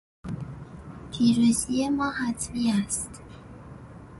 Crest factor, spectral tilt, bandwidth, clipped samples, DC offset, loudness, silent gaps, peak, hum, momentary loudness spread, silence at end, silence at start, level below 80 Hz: 18 dB; -4.5 dB/octave; 12 kHz; under 0.1%; under 0.1%; -26 LUFS; none; -10 dBFS; none; 23 LU; 0 s; 0.25 s; -50 dBFS